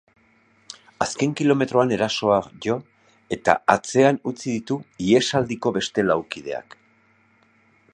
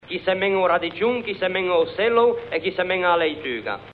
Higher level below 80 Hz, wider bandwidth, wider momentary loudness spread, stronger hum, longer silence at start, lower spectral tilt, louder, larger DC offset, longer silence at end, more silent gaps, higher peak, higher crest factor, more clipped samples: about the same, -58 dBFS vs -58 dBFS; first, 11 kHz vs 4.7 kHz; first, 13 LU vs 6 LU; neither; first, 0.7 s vs 0.05 s; second, -5 dB/octave vs -7 dB/octave; about the same, -22 LUFS vs -21 LUFS; neither; first, 1.35 s vs 0 s; neither; first, 0 dBFS vs -8 dBFS; first, 22 dB vs 14 dB; neither